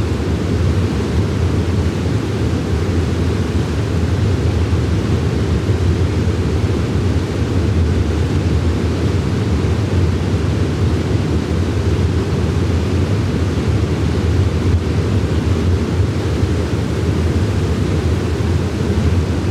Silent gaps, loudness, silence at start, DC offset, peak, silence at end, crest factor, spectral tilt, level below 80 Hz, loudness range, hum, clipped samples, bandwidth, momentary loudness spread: none; -17 LUFS; 0 s; under 0.1%; -4 dBFS; 0 s; 10 dB; -7 dB/octave; -26 dBFS; 1 LU; none; under 0.1%; 11.5 kHz; 2 LU